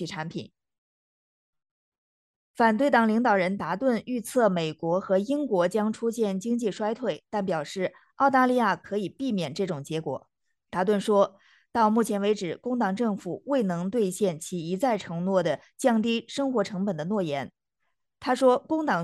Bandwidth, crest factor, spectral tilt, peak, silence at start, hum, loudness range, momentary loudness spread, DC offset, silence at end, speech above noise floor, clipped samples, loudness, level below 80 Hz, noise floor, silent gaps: 12.5 kHz; 18 dB; -5.5 dB/octave; -8 dBFS; 0 s; none; 3 LU; 10 LU; under 0.1%; 0 s; 55 dB; under 0.1%; -26 LUFS; -70 dBFS; -80 dBFS; 0.78-1.53 s, 1.71-1.92 s, 1.98-2.54 s